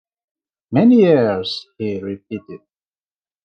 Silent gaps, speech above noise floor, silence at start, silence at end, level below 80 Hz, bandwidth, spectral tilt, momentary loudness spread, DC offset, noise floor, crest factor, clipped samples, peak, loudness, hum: none; over 74 dB; 0.7 s; 0.85 s; -66 dBFS; 6.4 kHz; -8 dB/octave; 18 LU; under 0.1%; under -90 dBFS; 16 dB; under 0.1%; -2 dBFS; -16 LUFS; none